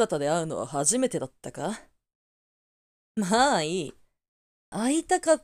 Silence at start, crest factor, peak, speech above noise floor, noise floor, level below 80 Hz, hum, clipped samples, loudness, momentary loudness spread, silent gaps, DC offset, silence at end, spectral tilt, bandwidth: 0 s; 20 dB; -8 dBFS; over 64 dB; under -90 dBFS; -62 dBFS; none; under 0.1%; -26 LUFS; 15 LU; 2.15-3.15 s, 4.28-4.72 s; under 0.1%; 0.05 s; -3.5 dB/octave; 15.5 kHz